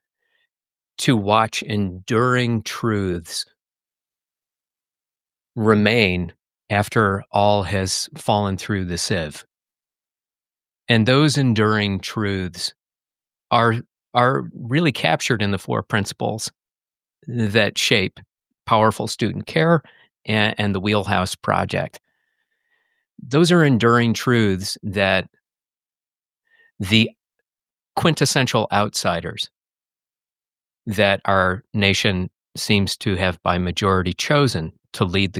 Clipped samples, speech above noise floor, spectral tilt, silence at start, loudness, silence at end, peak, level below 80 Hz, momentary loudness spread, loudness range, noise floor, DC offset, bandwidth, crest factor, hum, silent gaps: under 0.1%; over 71 dB; -5 dB/octave; 1 s; -20 LUFS; 0 s; -2 dBFS; -52 dBFS; 12 LU; 4 LU; under -90 dBFS; under 0.1%; 16 kHz; 20 dB; none; none